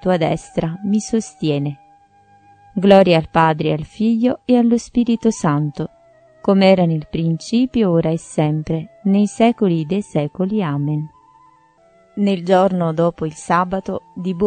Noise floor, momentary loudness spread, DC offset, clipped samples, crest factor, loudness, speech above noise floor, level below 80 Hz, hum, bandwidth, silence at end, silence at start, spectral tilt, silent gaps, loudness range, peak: -52 dBFS; 11 LU; under 0.1%; under 0.1%; 18 dB; -17 LUFS; 36 dB; -48 dBFS; none; 9.4 kHz; 0 s; 0.05 s; -7 dB/octave; none; 4 LU; 0 dBFS